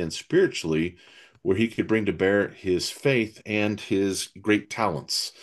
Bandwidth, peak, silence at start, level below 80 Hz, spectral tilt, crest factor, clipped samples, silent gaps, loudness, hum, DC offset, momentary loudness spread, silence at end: 12.5 kHz; -8 dBFS; 0 s; -62 dBFS; -4.5 dB/octave; 18 dB; under 0.1%; none; -25 LUFS; none; under 0.1%; 5 LU; 0.15 s